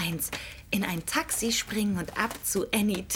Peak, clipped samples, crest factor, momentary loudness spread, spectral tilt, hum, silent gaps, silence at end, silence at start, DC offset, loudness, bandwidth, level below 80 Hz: -10 dBFS; under 0.1%; 18 dB; 5 LU; -3 dB/octave; none; none; 0 s; 0 s; under 0.1%; -29 LUFS; 19.5 kHz; -52 dBFS